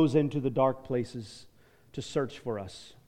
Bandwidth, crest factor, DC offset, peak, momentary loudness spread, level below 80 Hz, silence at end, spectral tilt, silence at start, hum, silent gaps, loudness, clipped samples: 11 kHz; 18 dB; under 0.1%; -12 dBFS; 17 LU; -60 dBFS; 0.2 s; -7 dB/octave; 0 s; none; none; -31 LUFS; under 0.1%